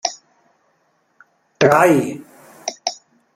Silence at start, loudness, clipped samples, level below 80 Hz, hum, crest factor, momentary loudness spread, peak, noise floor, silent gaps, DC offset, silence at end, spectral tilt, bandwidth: 0.05 s; -17 LUFS; under 0.1%; -64 dBFS; none; 20 dB; 24 LU; 0 dBFS; -63 dBFS; none; under 0.1%; 0.4 s; -4.5 dB/octave; 16 kHz